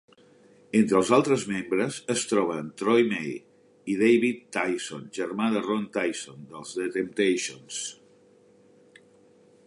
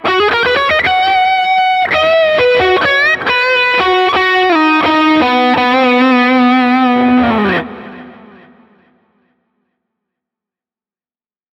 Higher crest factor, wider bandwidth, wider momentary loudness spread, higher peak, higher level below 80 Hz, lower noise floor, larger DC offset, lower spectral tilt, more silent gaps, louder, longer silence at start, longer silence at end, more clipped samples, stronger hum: first, 20 dB vs 12 dB; first, 11.5 kHz vs 7.8 kHz; first, 14 LU vs 2 LU; second, -8 dBFS vs 0 dBFS; second, -70 dBFS vs -46 dBFS; second, -58 dBFS vs under -90 dBFS; neither; about the same, -4.5 dB/octave vs -5 dB/octave; neither; second, -26 LUFS vs -10 LUFS; first, 0.75 s vs 0 s; second, 1.75 s vs 3.4 s; neither; neither